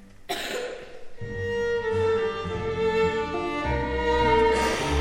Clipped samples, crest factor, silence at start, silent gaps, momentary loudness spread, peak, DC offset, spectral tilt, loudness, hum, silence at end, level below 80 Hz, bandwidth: under 0.1%; 16 dB; 0 s; none; 14 LU; -10 dBFS; under 0.1%; -5 dB/octave; -25 LUFS; none; 0 s; -38 dBFS; 16.5 kHz